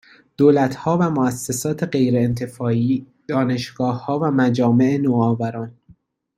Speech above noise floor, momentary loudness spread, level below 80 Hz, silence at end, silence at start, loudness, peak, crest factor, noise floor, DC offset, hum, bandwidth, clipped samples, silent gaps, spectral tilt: 35 dB; 8 LU; -56 dBFS; 0.65 s; 0.4 s; -19 LUFS; -2 dBFS; 16 dB; -53 dBFS; under 0.1%; none; 15 kHz; under 0.1%; none; -7 dB/octave